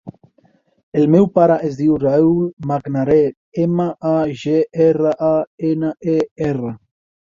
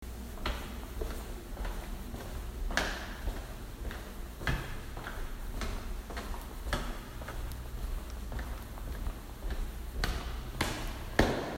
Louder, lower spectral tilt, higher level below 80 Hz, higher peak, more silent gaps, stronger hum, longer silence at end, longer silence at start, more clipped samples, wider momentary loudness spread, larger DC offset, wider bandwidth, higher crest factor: first, -17 LUFS vs -39 LUFS; first, -9 dB/octave vs -4.5 dB/octave; second, -52 dBFS vs -40 dBFS; first, 0 dBFS vs -10 dBFS; first, 0.83-0.92 s, 2.53-2.57 s, 3.37-3.52 s, 5.47-5.58 s, 6.31-6.36 s vs none; neither; first, 0.45 s vs 0 s; about the same, 0.05 s vs 0 s; neither; about the same, 8 LU vs 10 LU; neither; second, 7.4 kHz vs 16 kHz; second, 16 dB vs 28 dB